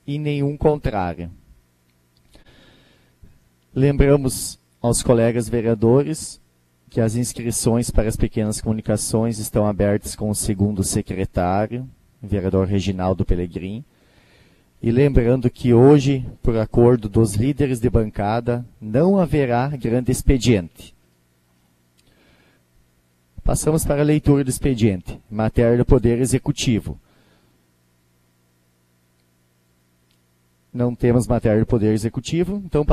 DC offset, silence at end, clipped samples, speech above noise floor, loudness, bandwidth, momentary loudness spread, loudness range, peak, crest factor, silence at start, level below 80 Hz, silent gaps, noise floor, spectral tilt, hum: under 0.1%; 0 s; under 0.1%; 43 dB; -19 LUFS; 14 kHz; 10 LU; 8 LU; 0 dBFS; 20 dB; 0.1 s; -32 dBFS; none; -62 dBFS; -6.5 dB/octave; 60 Hz at -45 dBFS